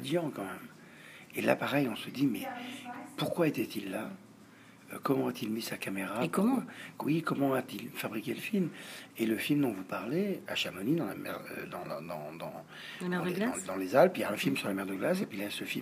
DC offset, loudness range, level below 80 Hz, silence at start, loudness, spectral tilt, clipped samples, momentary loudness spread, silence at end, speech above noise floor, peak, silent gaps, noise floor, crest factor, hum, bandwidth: under 0.1%; 4 LU; -78 dBFS; 0 s; -33 LUFS; -5.5 dB/octave; under 0.1%; 14 LU; 0 s; 23 dB; -10 dBFS; none; -56 dBFS; 24 dB; none; 15.5 kHz